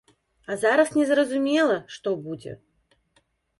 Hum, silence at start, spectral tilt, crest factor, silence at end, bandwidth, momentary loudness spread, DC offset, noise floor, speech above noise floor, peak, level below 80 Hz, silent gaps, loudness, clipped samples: none; 0.5 s; -4.5 dB/octave; 16 dB; 1.05 s; 11.5 kHz; 16 LU; under 0.1%; -67 dBFS; 45 dB; -8 dBFS; -68 dBFS; none; -23 LUFS; under 0.1%